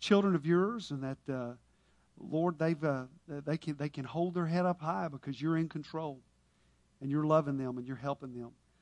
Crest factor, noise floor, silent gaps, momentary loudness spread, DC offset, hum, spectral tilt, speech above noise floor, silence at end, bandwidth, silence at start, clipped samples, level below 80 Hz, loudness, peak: 22 dB; -70 dBFS; none; 15 LU; under 0.1%; none; -7.5 dB/octave; 36 dB; 0.3 s; 10.5 kHz; 0 s; under 0.1%; -72 dBFS; -34 LUFS; -12 dBFS